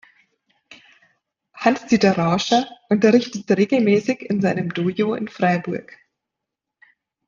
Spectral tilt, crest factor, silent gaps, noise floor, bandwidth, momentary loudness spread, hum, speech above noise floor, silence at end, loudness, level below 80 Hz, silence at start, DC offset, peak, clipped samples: -6 dB/octave; 18 dB; none; -83 dBFS; 7.4 kHz; 7 LU; none; 65 dB; 1.45 s; -19 LUFS; -62 dBFS; 0.7 s; under 0.1%; -2 dBFS; under 0.1%